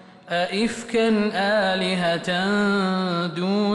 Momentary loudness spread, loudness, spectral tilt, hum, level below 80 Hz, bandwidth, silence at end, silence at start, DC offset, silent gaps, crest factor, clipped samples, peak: 4 LU; -22 LUFS; -5.5 dB/octave; none; -60 dBFS; 11.5 kHz; 0 s; 0.1 s; under 0.1%; none; 10 dB; under 0.1%; -12 dBFS